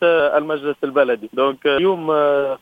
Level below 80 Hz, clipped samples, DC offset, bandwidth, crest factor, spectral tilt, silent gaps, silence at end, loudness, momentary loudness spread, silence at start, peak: -60 dBFS; under 0.1%; under 0.1%; 4.9 kHz; 14 dB; -6.5 dB/octave; none; 0.05 s; -18 LUFS; 4 LU; 0 s; -4 dBFS